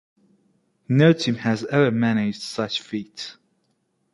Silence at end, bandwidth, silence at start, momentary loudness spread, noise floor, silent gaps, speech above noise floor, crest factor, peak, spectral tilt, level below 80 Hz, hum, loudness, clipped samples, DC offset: 0.8 s; 11.5 kHz; 0.9 s; 16 LU; -70 dBFS; none; 49 dB; 20 dB; -4 dBFS; -6.5 dB/octave; -64 dBFS; none; -21 LUFS; under 0.1%; under 0.1%